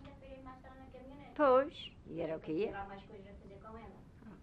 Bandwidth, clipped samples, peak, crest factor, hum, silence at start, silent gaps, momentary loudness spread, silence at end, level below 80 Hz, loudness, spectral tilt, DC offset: 5.6 kHz; under 0.1%; -18 dBFS; 20 dB; none; 0 s; none; 25 LU; 0 s; -62 dBFS; -35 LUFS; -7.5 dB/octave; under 0.1%